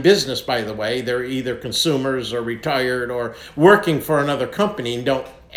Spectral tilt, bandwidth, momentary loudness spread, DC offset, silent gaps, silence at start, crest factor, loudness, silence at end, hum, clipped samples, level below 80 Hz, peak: -4.5 dB/octave; 18 kHz; 10 LU; under 0.1%; none; 0 s; 18 dB; -20 LUFS; 0 s; none; under 0.1%; -50 dBFS; 0 dBFS